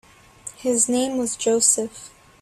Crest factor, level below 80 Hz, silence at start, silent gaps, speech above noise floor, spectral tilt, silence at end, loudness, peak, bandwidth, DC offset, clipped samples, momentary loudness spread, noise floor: 20 dB; -60 dBFS; 0.45 s; none; 21 dB; -2 dB/octave; 0.35 s; -20 LUFS; -4 dBFS; 15 kHz; under 0.1%; under 0.1%; 21 LU; -42 dBFS